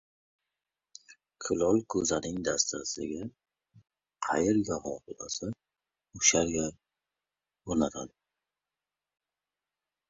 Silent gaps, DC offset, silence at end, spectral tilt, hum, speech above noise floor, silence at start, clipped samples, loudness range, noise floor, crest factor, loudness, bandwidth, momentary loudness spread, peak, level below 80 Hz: none; under 0.1%; 2 s; -3 dB/octave; 50 Hz at -70 dBFS; over 60 dB; 1.1 s; under 0.1%; 5 LU; under -90 dBFS; 26 dB; -30 LUFS; 8 kHz; 16 LU; -6 dBFS; -58 dBFS